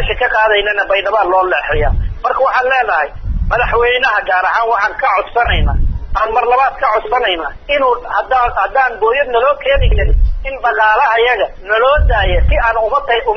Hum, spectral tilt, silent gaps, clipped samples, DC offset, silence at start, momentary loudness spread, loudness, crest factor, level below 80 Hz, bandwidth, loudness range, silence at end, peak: none; -6.5 dB/octave; none; under 0.1%; under 0.1%; 0 s; 6 LU; -13 LUFS; 12 dB; -20 dBFS; 6.2 kHz; 1 LU; 0 s; 0 dBFS